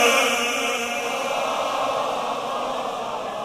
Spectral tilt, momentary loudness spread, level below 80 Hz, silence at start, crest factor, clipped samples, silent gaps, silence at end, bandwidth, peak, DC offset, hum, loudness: -1 dB/octave; 8 LU; -62 dBFS; 0 s; 18 dB; under 0.1%; none; 0 s; 16 kHz; -4 dBFS; under 0.1%; none; -23 LUFS